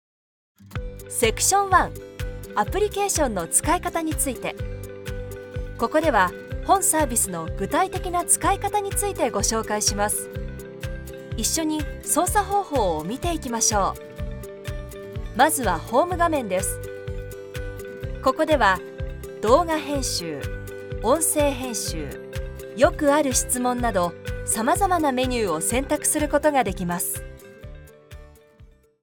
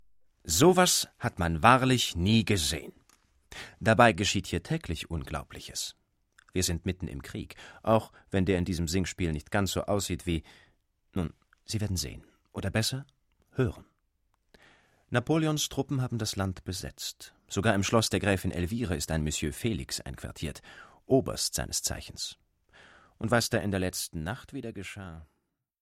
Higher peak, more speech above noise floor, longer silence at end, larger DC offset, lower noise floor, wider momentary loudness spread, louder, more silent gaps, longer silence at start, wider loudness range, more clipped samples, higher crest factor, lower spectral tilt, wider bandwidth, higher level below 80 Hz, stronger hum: about the same, -2 dBFS vs -4 dBFS; second, 30 dB vs 45 dB; second, 0.4 s vs 0.55 s; neither; second, -52 dBFS vs -74 dBFS; about the same, 15 LU vs 16 LU; first, -22 LUFS vs -29 LUFS; neither; first, 0.6 s vs 0.45 s; second, 3 LU vs 9 LU; neither; about the same, 22 dB vs 26 dB; about the same, -3.5 dB/octave vs -4.5 dB/octave; first, over 20 kHz vs 16 kHz; first, -36 dBFS vs -48 dBFS; neither